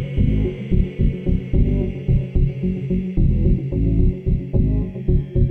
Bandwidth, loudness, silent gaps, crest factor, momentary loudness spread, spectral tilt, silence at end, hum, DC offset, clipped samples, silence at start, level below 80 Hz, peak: 3.6 kHz; -21 LUFS; none; 12 dB; 4 LU; -11.5 dB/octave; 0 s; none; under 0.1%; under 0.1%; 0 s; -22 dBFS; -6 dBFS